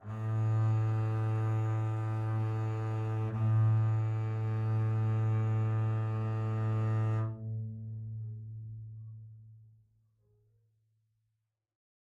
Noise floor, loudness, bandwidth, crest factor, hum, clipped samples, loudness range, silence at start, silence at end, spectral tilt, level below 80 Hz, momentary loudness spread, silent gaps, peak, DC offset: -84 dBFS; -33 LUFS; 3.7 kHz; 12 dB; none; under 0.1%; 16 LU; 0 s; 2.4 s; -9.5 dB/octave; -62 dBFS; 14 LU; none; -20 dBFS; under 0.1%